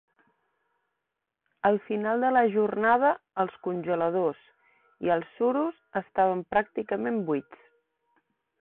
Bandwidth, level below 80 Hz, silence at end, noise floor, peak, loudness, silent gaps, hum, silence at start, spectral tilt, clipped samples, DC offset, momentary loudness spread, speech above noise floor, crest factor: 4.2 kHz; -68 dBFS; 1.1 s; -85 dBFS; -10 dBFS; -27 LUFS; none; none; 1.65 s; -10.5 dB/octave; under 0.1%; under 0.1%; 9 LU; 58 dB; 18 dB